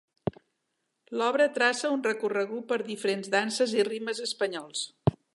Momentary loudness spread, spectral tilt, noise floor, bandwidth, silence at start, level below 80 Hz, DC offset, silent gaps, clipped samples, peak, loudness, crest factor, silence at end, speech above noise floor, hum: 10 LU; -4 dB/octave; -80 dBFS; 11.5 kHz; 0.25 s; -58 dBFS; under 0.1%; none; under 0.1%; -8 dBFS; -28 LUFS; 22 dB; 0.2 s; 52 dB; none